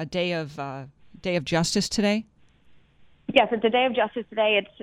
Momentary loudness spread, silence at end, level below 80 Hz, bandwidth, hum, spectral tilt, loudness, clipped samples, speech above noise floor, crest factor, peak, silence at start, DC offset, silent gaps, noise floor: 13 LU; 0.15 s; -56 dBFS; 15.5 kHz; none; -4.5 dB/octave; -24 LUFS; under 0.1%; 33 dB; 22 dB; -4 dBFS; 0 s; under 0.1%; none; -57 dBFS